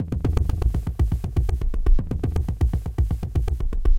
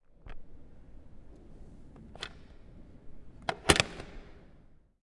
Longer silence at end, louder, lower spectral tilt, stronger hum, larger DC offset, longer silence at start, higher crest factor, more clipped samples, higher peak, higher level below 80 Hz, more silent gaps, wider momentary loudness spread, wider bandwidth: second, 0 s vs 0.45 s; first, -25 LUFS vs -30 LUFS; first, -8.5 dB/octave vs -3 dB/octave; neither; neither; about the same, 0 s vs 0.1 s; second, 16 dB vs 36 dB; neither; about the same, -4 dBFS vs -2 dBFS; first, -22 dBFS vs -50 dBFS; neither; second, 2 LU vs 30 LU; second, 10 kHz vs 11.5 kHz